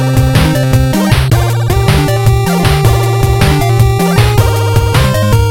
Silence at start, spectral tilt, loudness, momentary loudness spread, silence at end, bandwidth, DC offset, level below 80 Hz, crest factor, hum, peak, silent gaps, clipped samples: 0 s; -6 dB/octave; -10 LUFS; 2 LU; 0 s; 17 kHz; under 0.1%; -18 dBFS; 8 dB; none; 0 dBFS; none; 0.2%